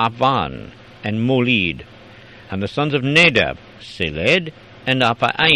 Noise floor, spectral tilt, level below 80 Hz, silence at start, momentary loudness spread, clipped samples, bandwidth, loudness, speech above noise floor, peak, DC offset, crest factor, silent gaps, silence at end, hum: -42 dBFS; -5.5 dB/octave; -46 dBFS; 0 s; 18 LU; under 0.1%; 11.5 kHz; -17 LUFS; 24 dB; 0 dBFS; under 0.1%; 18 dB; none; 0 s; none